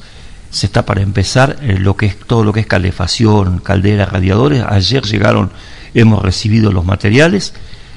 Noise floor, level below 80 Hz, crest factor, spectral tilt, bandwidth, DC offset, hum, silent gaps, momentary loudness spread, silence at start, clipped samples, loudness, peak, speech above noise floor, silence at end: -32 dBFS; -32 dBFS; 12 dB; -6 dB/octave; 11 kHz; under 0.1%; none; none; 5 LU; 0 s; 0.6%; -12 LUFS; 0 dBFS; 21 dB; 0 s